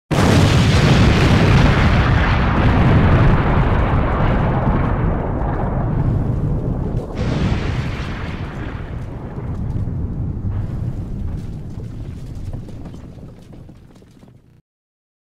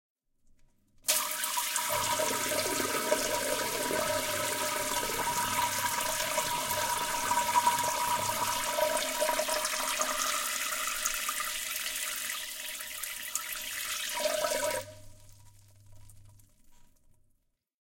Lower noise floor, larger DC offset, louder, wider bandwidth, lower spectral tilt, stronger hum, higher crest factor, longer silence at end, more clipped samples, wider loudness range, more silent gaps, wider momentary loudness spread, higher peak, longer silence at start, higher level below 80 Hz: second, -46 dBFS vs -74 dBFS; neither; first, -17 LUFS vs -30 LUFS; second, 13 kHz vs 17 kHz; first, -7 dB/octave vs -0.5 dB/octave; neither; second, 12 dB vs 24 dB; first, 1.6 s vs 1.2 s; neither; first, 18 LU vs 6 LU; neither; first, 18 LU vs 6 LU; first, -6 dBFS vs -10 dBFS; second, 0.1 s vs 1.05 s; first, -24 dBFS vs -60 dBFS